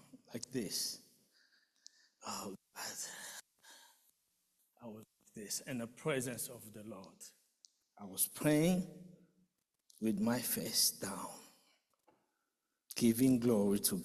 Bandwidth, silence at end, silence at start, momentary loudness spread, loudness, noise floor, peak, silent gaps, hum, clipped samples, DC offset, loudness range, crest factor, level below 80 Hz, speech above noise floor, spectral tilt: 14.5 kHz; 0 s; 0.15 s; 22 LU; -36 LUFS; -87 dBFS; -18 dBFS; none; none; under 0.1%; under 0.1%; 13 LU; 20 dB; -72 dBFS; 51 dB; -4 dB/octave